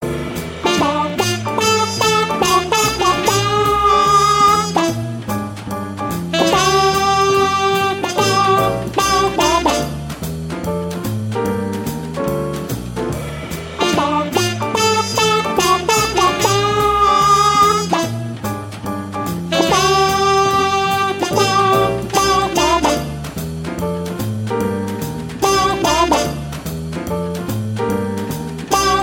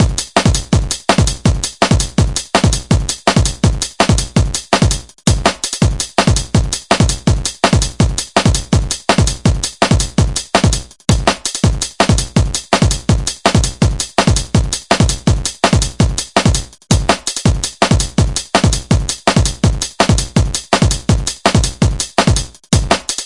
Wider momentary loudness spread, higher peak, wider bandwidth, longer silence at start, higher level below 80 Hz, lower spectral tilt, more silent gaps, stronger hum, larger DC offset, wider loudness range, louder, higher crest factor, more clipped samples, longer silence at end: first, 12 LU vs 3 LU; about the same, -2 dBFS vs 0 dBFS; first, 17 kHz vs 11.5 kHz; about the same, 0 s vs 0 s; second, -38 dBFS vs -22 dBFS; about the same, -4 dB/octave vs -4.5 dB/octave; neither; neither; second, under 0.1% vs 0.4%; first, 6 LU vs 1 LU; about the same, -16 LUFS vs -14 LUFS; about the same, 16 dB vs 14 dB; neither; about the same, 0 s vs 0 s